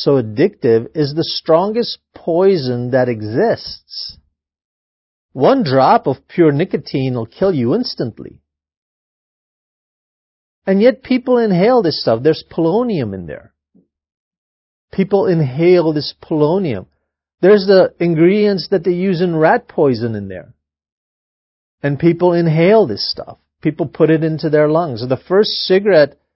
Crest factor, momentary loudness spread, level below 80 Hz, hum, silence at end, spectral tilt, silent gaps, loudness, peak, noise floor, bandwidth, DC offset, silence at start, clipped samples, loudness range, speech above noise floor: 16 dB; 12 LU; -52 dBFS; none; 0.25 s; -10.5 dB/octave; 4.65-5.29 s, 8.77-10.62 s, 14.17-14.31 s, 14.38-14.88 s, 20.92-21.78 s; -15 LUFS; 0 dBFS; -57 dBFS; 5.8 kHz; under 0.1%; 0 s; under 0.1%; 6 LU; 43 dB